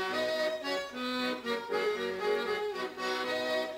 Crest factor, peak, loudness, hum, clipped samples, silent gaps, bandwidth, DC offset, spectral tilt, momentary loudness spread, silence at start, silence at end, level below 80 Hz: 12 dB; -20 dBFS; -33 LUFS; none; under 0.1%; none; 16 kHz; under 0.1%; -3 dB/octave; 4 LU; 0 s; 0 s; -72 dBFS